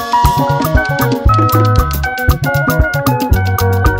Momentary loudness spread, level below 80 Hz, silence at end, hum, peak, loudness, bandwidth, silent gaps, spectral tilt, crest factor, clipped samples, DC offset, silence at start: 4 LU; -20 dBFS; 0 s; none; 0 dBFS; -13 LUFS; 16.5 kHz; none; -6 dB/octave; 12 dB; under 0.1%; 0.2%; 0 s